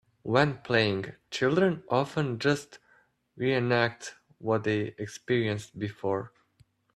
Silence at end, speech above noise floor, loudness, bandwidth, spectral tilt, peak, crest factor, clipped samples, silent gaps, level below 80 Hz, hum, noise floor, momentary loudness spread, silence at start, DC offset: 0.7 s; 37 dB; -28 LUFS; 12.5 kHz; -6 dB/octave; -8 dBFS; 22 dB; under 0.1%; none; -64 dBFS; none; -65 dBFS; 11 LU; 0.25 s; under 0.1%